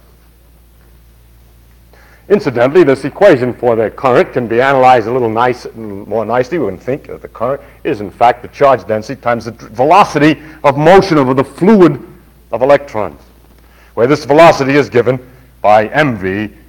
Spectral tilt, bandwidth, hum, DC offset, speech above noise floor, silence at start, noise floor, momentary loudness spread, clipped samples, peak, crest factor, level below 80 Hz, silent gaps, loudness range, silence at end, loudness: -6.5 dB/octave; 18 kHz; none; under 0.1%; 33 dB; 2.3 s; -44 dBFS; 14 LU; 2%; 0 dBFS; 12 dB; -42 dBFS; none; 5 LU; 0.2 s; -11 LUFS